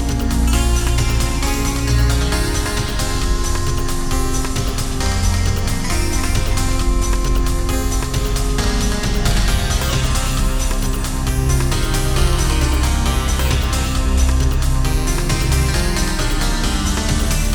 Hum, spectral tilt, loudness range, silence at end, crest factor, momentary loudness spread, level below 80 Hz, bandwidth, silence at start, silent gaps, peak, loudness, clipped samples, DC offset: none; -4.5 dB/octave; 2 LU; 0 s; 14 dB; 3 LU; -18 dBFS; over 20 kHz; 0 s; none; -2 dBFS; -19 LUFS; under 0.1%; under 0.1%